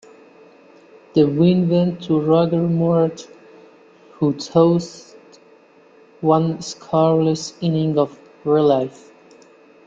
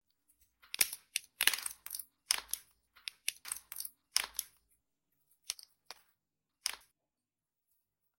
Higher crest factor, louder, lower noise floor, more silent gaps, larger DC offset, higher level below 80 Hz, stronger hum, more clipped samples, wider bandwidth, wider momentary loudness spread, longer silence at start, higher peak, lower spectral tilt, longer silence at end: second, 18 dB vs 36 dB; first, -18 LUFS vs -37 LUFS; second, -50 dBFS vs under -90 dBFS; neither; neither; first, -60 dBFS vs -76 dBFS; neither; neither; second, 7.6 kHz vs 17 kHz; second, 8 LU vs 21 LU; first, 1.15 s vs 0.8 s; first, -2 dBFS vs -6 dBFS; first, -7.5 dB/octave vs 3.5 dB/octave; second, 1 s vs 1.4 s